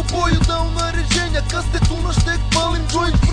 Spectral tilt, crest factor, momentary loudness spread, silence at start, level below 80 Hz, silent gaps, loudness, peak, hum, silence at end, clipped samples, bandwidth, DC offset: -4.5 dB/octave; 14 dB; 3 LU; 0 s; -20 dBFS; none; -18 LUFS; -2 dBFS; none; 0 s; under 0.1%; 10 kHz; under 0.1%